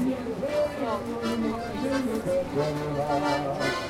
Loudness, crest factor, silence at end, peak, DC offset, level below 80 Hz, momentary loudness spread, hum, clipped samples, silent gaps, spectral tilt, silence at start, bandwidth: -28 LUFS; 14 dB; 0 s; -14 dBFS; under 0.1%; -50 dBFS; 4 LU; none; under 0.1%; none; -5.5 dB/octave; 0 s; 16 kHz